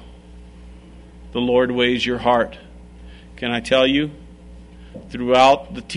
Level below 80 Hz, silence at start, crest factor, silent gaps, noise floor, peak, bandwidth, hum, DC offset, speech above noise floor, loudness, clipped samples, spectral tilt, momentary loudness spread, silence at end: -42 dBFS; 0 s; 18 dB; none; -42 dBFS; -2 dBFS; 10.5 kHz; none; under 0.1%; 24 dB; -18 LUFS; under 0.1%; -5 dB/octave; 15 LU; 0 s